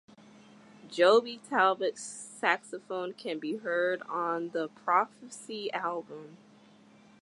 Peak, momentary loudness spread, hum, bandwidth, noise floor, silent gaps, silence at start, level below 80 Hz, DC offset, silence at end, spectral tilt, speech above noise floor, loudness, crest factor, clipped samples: -10 dBFS; 16 LU; none; 11.5 kHz; -58 dBFS; none; 0.85 s; -88 dBFS; under 0.1%; 0.85 s; -3 dB/octave; 28 dB; -30 LUFS; 22 dB; under 0.1%